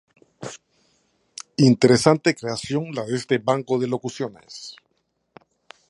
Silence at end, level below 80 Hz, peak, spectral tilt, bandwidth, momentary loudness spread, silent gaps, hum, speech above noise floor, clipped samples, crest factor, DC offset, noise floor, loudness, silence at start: 1.2 s; -60 dBFS; 0 dBFS; -5.5 dB/octave; 11.5 kHz; 22 LU; none; none; 51 dB; under 0.1%; 22 dB; under 0.1%; -71 dBFS; -21 LUFS; 0.4 s